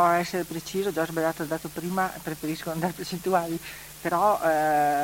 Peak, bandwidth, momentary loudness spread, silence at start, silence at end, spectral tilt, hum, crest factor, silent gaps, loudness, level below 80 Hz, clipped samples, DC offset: -10 dBFS; 17 kHz; 10 LU; 0 s; 0 s; -5 dB/octave; none; 16 dB; none; -27 LUFS; -56 dBFS; under 0.1%; under 0.1%